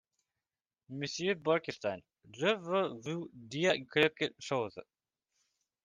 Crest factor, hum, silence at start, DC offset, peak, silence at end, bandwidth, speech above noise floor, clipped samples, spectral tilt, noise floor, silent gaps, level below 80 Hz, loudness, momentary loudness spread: 22 dB; none; 0.9 s; under 0.1%; -14 dBFS; 1.05 s; 9.8 kHz; over 56 dB; under 0.1%; -4.5 dB/octave; under -90 dBFS; none; -78 dBFS; -34 LUFS; 12 LU